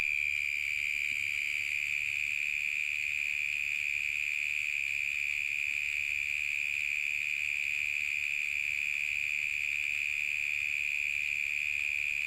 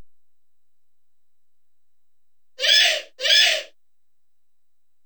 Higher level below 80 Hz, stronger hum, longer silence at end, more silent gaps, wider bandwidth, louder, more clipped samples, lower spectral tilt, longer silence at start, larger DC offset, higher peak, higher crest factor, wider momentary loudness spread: first, -66 dBFS vs -86 dBFS; neither; second, 0 s vs 1.4 s; neither; second, 16.5 kHz vs over 20 kHz; second, -30 LUFS vs -16 LUFS; neither; first, 1.5 dB/octave vs 4 dB/octave; about the same, 0 s vs 0 s; second, under 0.1% vs 0.3%; second, -18 dBFS vs -4 dBFS; second, 16 dB vs 22 dB; second, 1 LU vs 9 LU